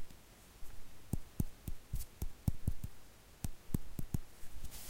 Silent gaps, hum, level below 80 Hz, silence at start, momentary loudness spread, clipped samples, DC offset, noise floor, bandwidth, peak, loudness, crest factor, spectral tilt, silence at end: none; none; -46 dBFS; 0 s; 17 LU; under 0.1%; under 0.1%; -58 dBFS; 16.5 kHz; -20 dBFS; -45 LUFS; 20 dB; -6 dB/octave; 0 s